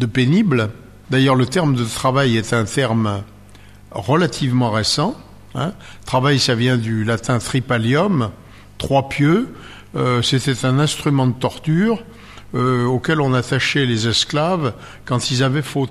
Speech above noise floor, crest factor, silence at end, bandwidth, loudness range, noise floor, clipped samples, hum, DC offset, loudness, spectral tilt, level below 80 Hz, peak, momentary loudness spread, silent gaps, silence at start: 24 dB; 14 dB; 0 s; 13.5 kHz; 1 LU; -42 dBFS; under 0.1%; none; under 0.1%; -18 LUFS; -5.5 dB/octave; -46 dBFS; -4 dBFS; 10 LU; none; 0 s